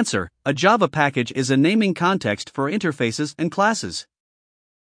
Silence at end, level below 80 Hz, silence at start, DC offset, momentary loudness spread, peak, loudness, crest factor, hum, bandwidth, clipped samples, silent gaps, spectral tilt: 0.9 s; -60 dBFS; 0 s; under 0.1%; 8 LU; -2 dBFS; -20 LUFS; 20 dB; none; 10.5 kHz; under 0.1%; none; -5 dB/octave